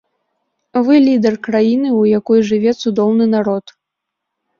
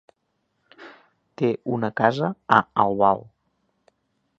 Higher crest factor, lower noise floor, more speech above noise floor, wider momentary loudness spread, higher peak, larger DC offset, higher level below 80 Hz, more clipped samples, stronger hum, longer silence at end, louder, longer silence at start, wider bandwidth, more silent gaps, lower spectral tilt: second, 12 dB vs 24 dB; first, -78 dBFS vs -73 dBFS; first, 66 dB vs 52 dB; about the same, 7 LU vs 7 LU; about the same, -2 dBFS vs 0 dBFS; neither; about the same, -58 dBFS vs -62 dBFS; neither; neither; second, 1 s vs 1.15 s; first, -14 LUFS vs -22 LUFS; about the same, 0.75 s vs 0.8 s; second, 7 kHz vs 8 kHz; neither; about the same, -7 dB/octave vs -7.5 dB/octave